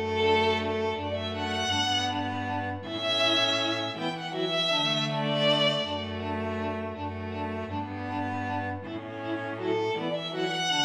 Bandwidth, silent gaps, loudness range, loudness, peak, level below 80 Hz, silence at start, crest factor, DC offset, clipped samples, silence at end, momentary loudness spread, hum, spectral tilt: 14.5 kHz; none; 7 LU; -28 LUFS; -12 dBFS; -64 dBFS; 0 s; 16 dB; under 0.1%; under 0.1%; 0 s; 10 LU; none; -4 dB/octave